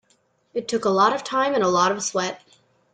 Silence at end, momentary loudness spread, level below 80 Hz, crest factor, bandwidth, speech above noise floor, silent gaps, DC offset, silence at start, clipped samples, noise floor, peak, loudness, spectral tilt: 0.55 s; 12 LU; -68 dBFS; 18 dB; 9.6 kHz; 43 dB; none; under 0.1%; 0.55 s; under 0.1%; -65 dBFS; -6 dBFS; -22 LUFS; -3.5 dB/octave